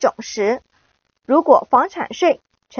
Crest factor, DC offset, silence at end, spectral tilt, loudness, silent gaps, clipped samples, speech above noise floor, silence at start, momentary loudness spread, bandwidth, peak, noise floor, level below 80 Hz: 18 dB; under 0.1%; 0 s; -2.5 dB/octave; -17 LUFS; none; under 0.1%; 48 dB; 0 s; 10 LU; 6.8 kHz; 0 dBFS; -64 dBFS; -62 dBFS